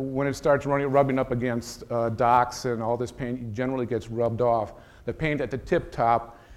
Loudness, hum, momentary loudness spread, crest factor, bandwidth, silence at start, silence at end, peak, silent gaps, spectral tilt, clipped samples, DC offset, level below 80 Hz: -26 LUFS; none; 9 LU; 18 dB; 14.5 kHz; 0 s; 0 s; -6 dBFS; none; -6.5 dB/octave; under 0.1%; under 0.1%; -48 dBFS